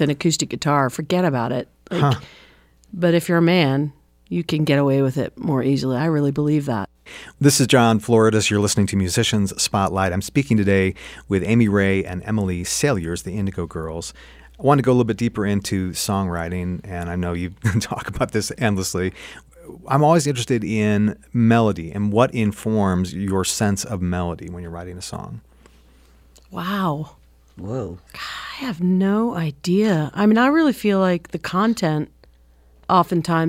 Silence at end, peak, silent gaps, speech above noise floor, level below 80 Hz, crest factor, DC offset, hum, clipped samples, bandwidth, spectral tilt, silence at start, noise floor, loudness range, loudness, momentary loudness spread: 0 s; -2 dBFS; none; 32 dB; -46 dBFS; 18 dB; under 0.1%; none; under 0.1%; 16.5 kHz; -5.5 dB/octave; 0 s; -52 dBFS; 7 LU; -20 LUFS; 14 LU